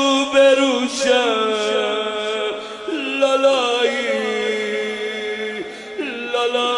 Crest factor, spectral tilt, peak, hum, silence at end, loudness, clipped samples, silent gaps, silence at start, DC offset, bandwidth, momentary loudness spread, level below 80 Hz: 16 dB; -2 dB/octave; -4 dBFS; none; 0 s; -19 LUFS; under 0.1%; none; 0 s; under 0.1%; 11.5 kHz; 12 LU; -64 dBFS